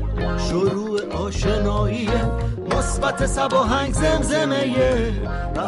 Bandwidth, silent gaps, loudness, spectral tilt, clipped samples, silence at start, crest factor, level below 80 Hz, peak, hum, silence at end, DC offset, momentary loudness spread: 11.5 kHz; none; -21 LUFS; -5.5 dB/octave; under 0.1%; 0 s; 12 dB; -28 dBFS; -8 dBFS; none; 0 s; under 0.1%; 6 LU